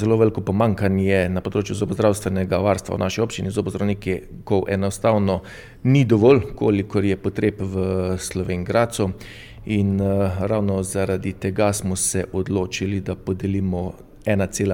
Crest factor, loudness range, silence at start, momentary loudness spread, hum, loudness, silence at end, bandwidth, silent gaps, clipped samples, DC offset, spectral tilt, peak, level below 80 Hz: 18 dB; 3 LU; 0 s; 7 LU; none; -21 LUFS; 0 s; 17.5 kHz; none; under 0.1%; under 0.1%; -6 dB/octave; -4 dBFS; -44 dBFS